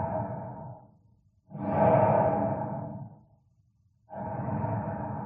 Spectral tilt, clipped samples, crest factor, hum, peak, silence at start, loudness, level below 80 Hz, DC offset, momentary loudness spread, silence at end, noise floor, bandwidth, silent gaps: -9.5 dB/octave; under 0.1%; 20 dB; none; -10 dBFS; 0 s; -29 LUFS; -60 dBFS; under 0.1%; 22 LU; 0 s; -67 dBFS; 3.6 kHz; none